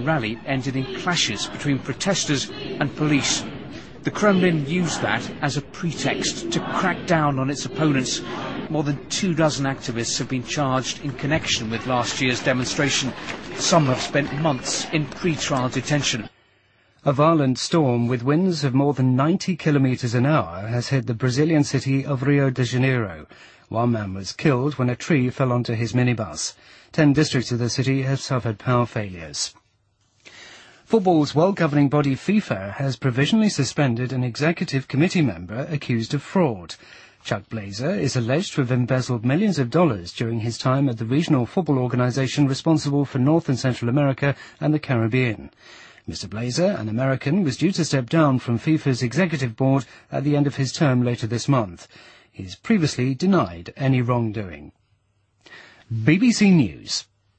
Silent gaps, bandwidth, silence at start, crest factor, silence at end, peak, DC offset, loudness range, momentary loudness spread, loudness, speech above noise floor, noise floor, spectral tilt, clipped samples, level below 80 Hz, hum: none; 8.8 kHz; 0 s; 18 dB; 0.35 s; -4 dBFS; under 0.1%; 3 LU; 9 LU; -22 LUFS; 44 dB; -65 dBFS; -5.5 dB/octave; under 0.1%; -52 dBFS; none